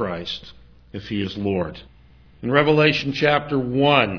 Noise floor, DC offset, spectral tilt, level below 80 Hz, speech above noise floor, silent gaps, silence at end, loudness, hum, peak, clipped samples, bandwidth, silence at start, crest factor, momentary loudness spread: -50 dBFS; under 0.1%; -6.5 dB/octave; -50 dBFS; 29 dB; none; 0 s; -20 LUFS; none; -2 dBFS; under 0.1%; 5.4 kHz; 0 s; 20 dB; 16 LU